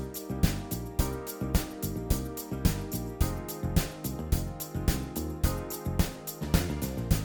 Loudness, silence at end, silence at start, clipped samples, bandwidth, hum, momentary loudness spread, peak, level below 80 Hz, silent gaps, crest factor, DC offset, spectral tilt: -32 LUFS; 0 s; 0 s; under 0.1%; over 20 kHz; none; 5 LU; -10 dBFS; -36 dBFS; none; 20 dB; under 0.1%; -5.5 dB/octave